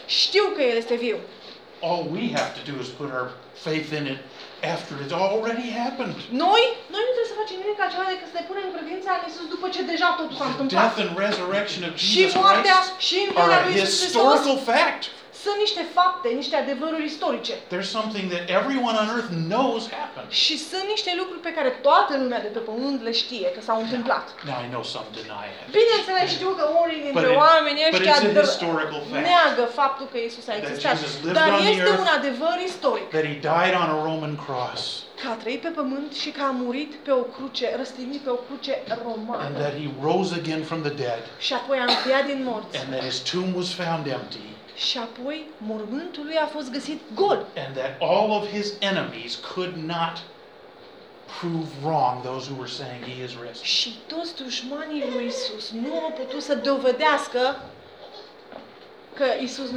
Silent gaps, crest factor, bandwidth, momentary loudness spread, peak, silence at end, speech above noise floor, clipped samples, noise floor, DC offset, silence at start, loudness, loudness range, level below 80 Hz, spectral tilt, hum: none; 22 dB; 13 kHz; 14 LU; -2 dBFS; 0 s; 23 dB; under 0.1%; -47 dBFS; under 0.1%; 0 s; -23 LUFS; 9 LU; -76 dBFS; -4 dB/octave; none